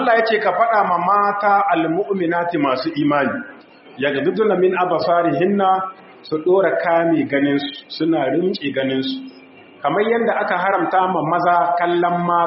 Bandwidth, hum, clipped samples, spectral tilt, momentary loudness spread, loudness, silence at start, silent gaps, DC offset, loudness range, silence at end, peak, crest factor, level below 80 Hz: 5.8 kHz; none; under 0.1%; -4 dB/octave; 7 LU; -18 LUFS; 0 s; none; under 0.1%; 3 LU; 0 s; -2 dBFS; 16 dB; -66 dBFS